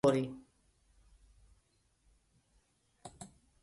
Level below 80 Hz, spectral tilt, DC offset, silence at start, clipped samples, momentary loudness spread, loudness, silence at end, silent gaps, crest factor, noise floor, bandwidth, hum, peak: -68 dBFS; -6.5 dB/octave; under 0.1%; 0.05 s; under 0.1%; 22 LU; -37 LUFS; 0.35 s; none; 24 dB; -74 dBFS; 11.5 kHz; none; -16 dBFS